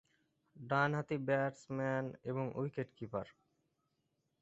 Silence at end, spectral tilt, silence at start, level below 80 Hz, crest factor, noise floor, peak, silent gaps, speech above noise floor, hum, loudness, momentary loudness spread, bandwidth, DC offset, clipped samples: 1.1 s; -6 dB/octave; 0.55 s; -74 dBFS; 22 dB; -83 dBFS; -18 dBFS; none; 45 dB; none; -38 LUFS; 10 LU; 8 kHz; under 0.1%; under 0.1%